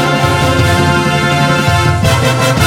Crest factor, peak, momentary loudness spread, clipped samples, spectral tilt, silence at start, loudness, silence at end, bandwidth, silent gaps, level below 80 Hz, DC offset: 10 dB; 0 dBFS; 1 LU; under 0.1%; -5 dB/octave; 0 s; -11 LUFS; 0 s; 17 kHz; none; -28 dBFS; under 0.1%